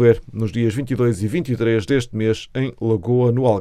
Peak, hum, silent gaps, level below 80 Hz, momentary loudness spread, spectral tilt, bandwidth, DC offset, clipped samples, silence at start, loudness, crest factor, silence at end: -2 dBFS; none; none; -44 dBFS; 6 LU; -7.5 dB/octave; 12.5 kHz; under 0.1%; under 0.1%; 0 s; -20 LUFS; 18 dB; 0 s